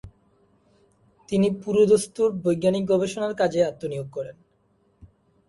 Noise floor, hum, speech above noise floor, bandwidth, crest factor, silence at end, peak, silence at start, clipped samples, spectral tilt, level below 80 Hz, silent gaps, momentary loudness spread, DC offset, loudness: -65 dBFS; none; 43 dB; 11.5 kHz; 18 dB; 1.15 s; -8 dBFS; 0.05 s; under 0.1%; -6 dB/octave; -58 dBFS; none; 13 LU; under 0.1%; -23 LUFS